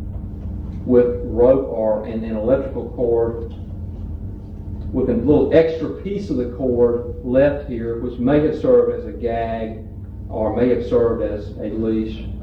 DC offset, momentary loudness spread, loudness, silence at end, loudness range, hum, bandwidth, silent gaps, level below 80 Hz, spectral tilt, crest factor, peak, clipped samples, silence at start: under 0.1%; 15 LU; -19 LUFS; 0 s; 3 LU; none; 6 kHz; none; -34 dBFS; -9.5 dB/octave; 18 dB; -2 dBFS; under 0.1%; 0 s